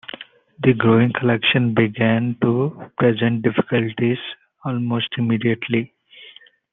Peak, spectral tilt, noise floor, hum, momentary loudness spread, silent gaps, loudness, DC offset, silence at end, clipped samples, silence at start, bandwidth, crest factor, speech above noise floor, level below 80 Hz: -2 dBFS; -10.5 dB/octave; -46 dBFS; none; 11 LU; none; -19 LUFS; under 0.1%; 0.45 s; under 0.1%; 0.2 s; 4 kHz; 18 dB; 28 dB; -60 dBFS